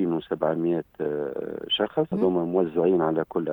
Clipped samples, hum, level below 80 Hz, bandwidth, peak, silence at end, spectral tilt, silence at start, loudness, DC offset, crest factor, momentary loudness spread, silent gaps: under 0.1%; none; -62 dBFS; 19 kHz; -8 dBFS; 0 s; -9 dB/octave; 0 s; -25 LUFS; under 0.1%; 16 dB; 8 LU; none